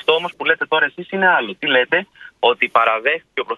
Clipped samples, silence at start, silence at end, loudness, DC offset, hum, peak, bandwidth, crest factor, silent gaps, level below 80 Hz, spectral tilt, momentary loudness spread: under 0.1%; 0.1 s; 0 s; -17 LUFS; under 0.1%; none; 0 dBFS; 7 kHz; 18 dB; none; -68 dBFS; -5 dB/octave; 5 LU